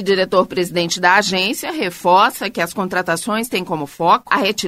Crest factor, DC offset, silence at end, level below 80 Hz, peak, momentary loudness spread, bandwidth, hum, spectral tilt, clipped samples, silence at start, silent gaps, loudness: 16 dB; under 0.1%; 0 s; -56 dBFS; 0 dBFS; 8 LU; 16 kHz; none; -3.5 dB/octave; under 0.1%; 0 s; none; -17 LUFS